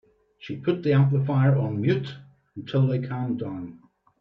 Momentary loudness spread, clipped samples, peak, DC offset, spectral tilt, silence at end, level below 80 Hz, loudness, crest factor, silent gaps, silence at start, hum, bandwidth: 20 LU; under 0.1%; -10 dBFS; under 0.1%; -10 dB/octave; 0.45 s; -62 dBFS; -24 LUFS; 16 dB; none; 0.4 s; none; 5.4 kHz